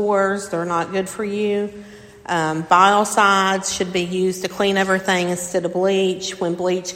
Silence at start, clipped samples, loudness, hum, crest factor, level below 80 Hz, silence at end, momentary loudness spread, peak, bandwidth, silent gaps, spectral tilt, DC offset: 0 s; under 0.1%; -19 LUFS; none; 20 dB; -56 dBFS; 0 s; 9 LU; 0 dBFS; 16.5 kHz; none; -4 dB/octave; under 0.1%